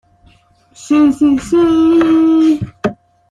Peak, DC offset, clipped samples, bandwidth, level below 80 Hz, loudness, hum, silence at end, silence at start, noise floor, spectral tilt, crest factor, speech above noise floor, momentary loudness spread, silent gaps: -2 dBFS; under 0.1%; under 0.1%; 10.5 kHz; -44 dBFS; -12 LUFS; none; 0.35 s; 0.8 s; -49 dBFS; -6.5 dB/octave; 12 dB; 39 dB; 10 LU; none